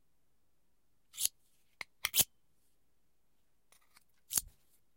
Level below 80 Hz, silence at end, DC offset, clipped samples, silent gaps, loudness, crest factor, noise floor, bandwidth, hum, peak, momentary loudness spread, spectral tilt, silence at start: -70 dBFS; 0.5 s; under 0.1%; under 0.1%; none; -34 LUFS; 32 dB; -81 dBFS; 16.5 kHz; none; -10 dBFS; 20 LU; 1 dB/octave; 1.15 s